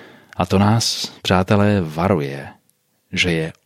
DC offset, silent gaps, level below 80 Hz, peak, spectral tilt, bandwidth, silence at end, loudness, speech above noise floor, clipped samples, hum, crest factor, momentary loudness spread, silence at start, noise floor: under 0.1%; none; -48 dBFS; -2 dBFS; -5 dB/octave; 15.5 kHz; 0.15 s; -18 LUFS; 46 dB; under 0.1%; none; 18 dB; 13 LU; 0 s; -64 dBFS